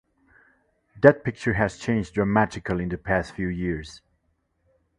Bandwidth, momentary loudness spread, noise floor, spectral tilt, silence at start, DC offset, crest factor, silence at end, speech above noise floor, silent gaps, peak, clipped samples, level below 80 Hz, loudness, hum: 11 kHz; 11 LU; -71 dBFS; -7 dB/octave; 0.95 s; under 0.1%; 24 dB; 1 s; 48 dB; none; 0 dBFS; under 0.1%; -46 dBFS; -24 LUFS; none